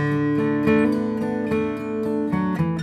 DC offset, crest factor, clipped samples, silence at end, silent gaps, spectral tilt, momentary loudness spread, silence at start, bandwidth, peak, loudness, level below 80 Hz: under 0.1%; 16 dB; under 0.1%; 0 s; none; -8.5 dB/octave; 6 LU; 0 s; 11 kHz; -6 dBFS; -22 LUFS; -50 dBFS